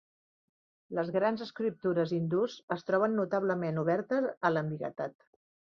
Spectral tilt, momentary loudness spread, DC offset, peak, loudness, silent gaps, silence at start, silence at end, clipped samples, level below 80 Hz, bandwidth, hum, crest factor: -8 dB/octave; 8 LU; under 0.1%; -12 dBFS; -32 LUFS; 2.63-2.68 s, 4.37-4.41 s; 0.9 s; 0.65 s; under 0.1%; -76 dBFS; 7 kHz; none; 20 dB